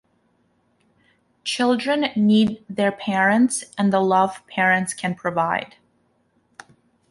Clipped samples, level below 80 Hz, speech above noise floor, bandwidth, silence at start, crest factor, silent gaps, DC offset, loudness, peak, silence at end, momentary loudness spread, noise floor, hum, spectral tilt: under 0.1%; -64 dBFS; 45 dB; 11.5 kHz; 1.45 s; 16 dB; none; under 0.1%; -20 LUFS; -6 dBFS; 1.45 s; 8 LU; -65 dBFS; none; -4.5 dB/octave